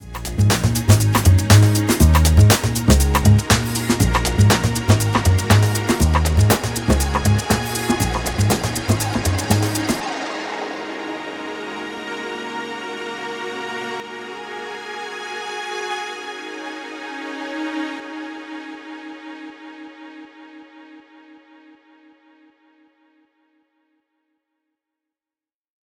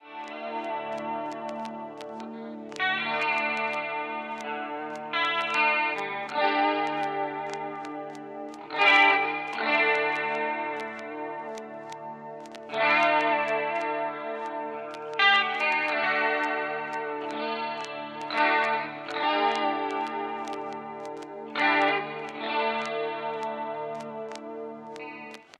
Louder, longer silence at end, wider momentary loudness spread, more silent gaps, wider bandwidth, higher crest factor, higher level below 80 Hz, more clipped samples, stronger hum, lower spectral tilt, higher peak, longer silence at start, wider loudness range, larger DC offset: first, -19 LUFS vs -27 LUFS; first, 4.95 s vs 0.15 s; about the same, 17 LU vs 17 LU; neither; first, 19.5 kHz vs 11 kHz; about the same, 20 dB vs 22 dB; first, -28 dBFS vs -84 dBFS; neither; neither; first, -5 dB/octave vs -3.5 dB/octave; first, 0 dBFS vs -8 dBFS; about the same, 0 s vs 0.05 s; first, 16 LU vs 6 LU; neither